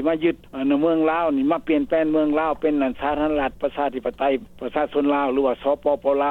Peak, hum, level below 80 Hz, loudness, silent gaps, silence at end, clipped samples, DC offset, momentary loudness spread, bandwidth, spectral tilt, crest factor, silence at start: -6 dBFS; none; -48 dBFS; -22 LUFS; none; 0 s; under 0.1%; 0.1%; 5 LU; 4.2 kHz; -7.5 dB/octave; 14 dB; 0 s